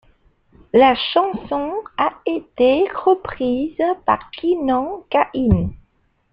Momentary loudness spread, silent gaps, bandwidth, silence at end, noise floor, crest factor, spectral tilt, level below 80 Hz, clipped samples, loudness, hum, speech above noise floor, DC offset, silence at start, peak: 9 LU; none; 5.4 kHz; 0.55 s; -60 dBFS; 18 dB; -9 dB/octave; -40 dBFS; under 0.1%; -19 LUFS; none; 42 dB; under 0.1%; 0.75 s; -2 dBFS